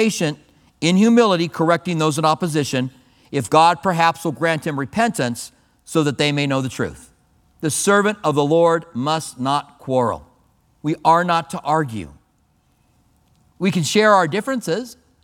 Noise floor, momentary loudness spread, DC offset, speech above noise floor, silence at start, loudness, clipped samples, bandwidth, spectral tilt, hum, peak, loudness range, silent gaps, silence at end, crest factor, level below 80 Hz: -61 dBFS; 12 LU; under 0.1%; 43 dB; 0 s; -19 LUFS; under 0.1%; 18 kHz; -5 dB/octave; none; 0 dBFS; 4 LU; none; 0.3 s; 18 dB; -56 dBFS